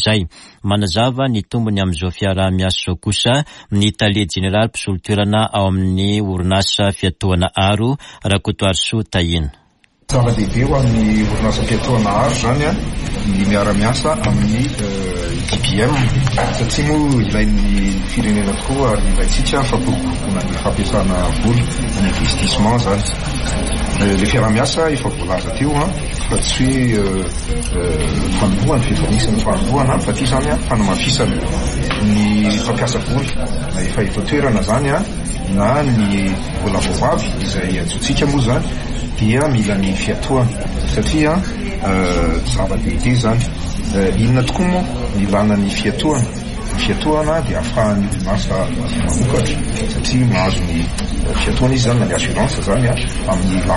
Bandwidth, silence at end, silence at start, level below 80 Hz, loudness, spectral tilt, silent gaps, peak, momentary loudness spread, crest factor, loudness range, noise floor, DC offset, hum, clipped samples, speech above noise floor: 11.5 kHz; 0 s; 0 s; -24 dBFS; -16 LUFS; -5.5 dB/octave; none; -4 dBFS; 6 LU; 12 dB; 1 LU; -42 dBFS; under 0.1%; none; under 0.1%; 27 dB